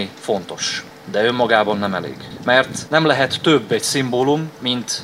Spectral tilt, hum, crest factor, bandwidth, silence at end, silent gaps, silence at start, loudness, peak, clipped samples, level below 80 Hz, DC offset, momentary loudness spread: -3.5 dB/octave; none; 18 dB; 16 kHz; 0 s; none; 0 s; -18 LUFS; 0 dBFS; under 0.1%; -58 dBFS; under 0.1%; 9 LU